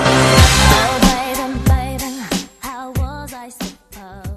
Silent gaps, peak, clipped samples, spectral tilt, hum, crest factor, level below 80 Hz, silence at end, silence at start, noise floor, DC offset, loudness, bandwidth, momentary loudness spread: none; 0 dBFS; under 0.1%; -4 dB/octave; none; 16 dB; -22 dBFS; 0 s; 0 s; -37 dBFS; under 0.1%; -14 LUFS; 13.5 kHz; 20 LU